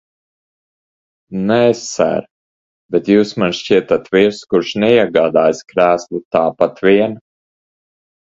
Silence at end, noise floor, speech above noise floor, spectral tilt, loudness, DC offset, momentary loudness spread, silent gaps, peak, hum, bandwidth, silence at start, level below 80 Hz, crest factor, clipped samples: 1.1 s; under -90 dBFS; over 76 dB; -5.5 dB/octave; -15 LUFS; under 0.1%; 7 LU; 2.31-2.89 s, 6.25-6.31 s; 0 dBFS; none; 7.8 kHz; 1.3 s; -54 dBFS; 16 dB; under 0.1%